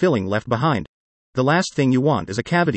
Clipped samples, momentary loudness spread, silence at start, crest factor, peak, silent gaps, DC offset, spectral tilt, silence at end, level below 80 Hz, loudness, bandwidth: under 0.1%; 5 LU; 0 s; 14 dB; -6 dBFS; 0.89-1.33 s; under 0.1%; -6.5 dB/octave; 0 s; -54 dBFS; -20 LUFS; 8.8 kHz